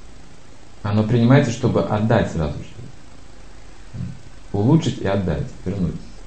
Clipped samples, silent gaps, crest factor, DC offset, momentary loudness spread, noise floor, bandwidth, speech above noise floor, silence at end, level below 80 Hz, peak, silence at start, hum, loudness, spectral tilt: under 0.1%; none; 20 dB; 2%; 18 LU; -45 dBFS; 8.8 kHz; 27 dB; 0 s; -38 dBFS; -2 dBFS; 0 s; none; -20 LUFS; -7.5 dB/octave